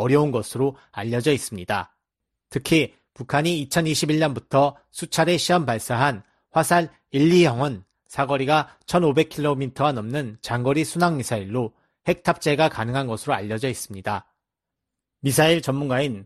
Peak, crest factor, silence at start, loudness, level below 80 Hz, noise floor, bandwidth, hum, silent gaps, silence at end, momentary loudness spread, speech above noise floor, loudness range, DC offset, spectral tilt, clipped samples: -4 dBFS; 18 dB; 0 s; -22 LUFS; -56 dBFS; -84 dBFS; 13.5 kHz; none; none; 0 s; 10 LU; 63 dB; 4 LU; under 0.1%; -5 dB/octave; under 0.1%